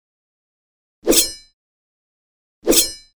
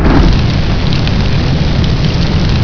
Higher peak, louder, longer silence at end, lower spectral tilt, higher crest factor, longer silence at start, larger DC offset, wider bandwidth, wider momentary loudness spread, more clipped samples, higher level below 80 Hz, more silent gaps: about the same, 0 dBFS vs 0 dBFS; second, -15 LUFS vs -12 LUFS; first, 0.2 s vs 0 s; second, -1 dB/octave vs -7 dB/octave; first, 22 dB vs 10 dB; first, 1.05 s vs 0 s; neither; first, over 20 kHz vs 5.4 kHz; first, 12 LU vs 3 LU; second, under 0.1% vs 0.4%; second, -42 dBFS vs -14 dBFS; first, 1.53-2.62 s vs none